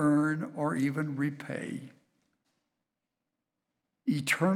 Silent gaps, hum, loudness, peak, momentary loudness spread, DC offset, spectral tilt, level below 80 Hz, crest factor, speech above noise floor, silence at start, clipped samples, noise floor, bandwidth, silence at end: none; none; -32 LUFS; -14 dBFS; 11 LU; under 0.1%; -6 dB/octave; -80 dBFS; 20 dB; 56 dB; 0 s; under 0.1%; -87 dBFS; 16.5 kHz; 0 s